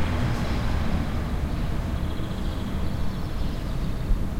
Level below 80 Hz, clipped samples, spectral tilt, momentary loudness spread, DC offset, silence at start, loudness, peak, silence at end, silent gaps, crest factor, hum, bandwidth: -28 dBFS; under 0.1%; -7 dB/octave; 4 LU; under 0.1%; 0 s; -29 LUFS; -10 dBFS; 0 s; none; 16 dB; none; 16 kHz